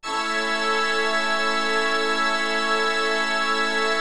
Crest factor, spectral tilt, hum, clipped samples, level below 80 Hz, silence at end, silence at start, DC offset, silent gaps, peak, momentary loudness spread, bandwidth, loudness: 12 dB; -1 dB/octave; none; under 0.1%; -64 dBFS; 0 s; 0 s; 2%; none; -10 dBFS; 1 LU; 14.5 kHz; -21 LUFS